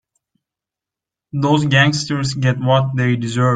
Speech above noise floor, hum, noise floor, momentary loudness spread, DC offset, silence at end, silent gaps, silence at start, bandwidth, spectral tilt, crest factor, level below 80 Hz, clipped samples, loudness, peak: 71 dB; none; -87 dBFS; 7 LU; under 0.1%; 0 s; none; 1.35 s; 9.2 kHz; -5.5 dB/octave; 16 dB; -52 dBFS; under 0.1%; -16 LUFS; -2 dBFS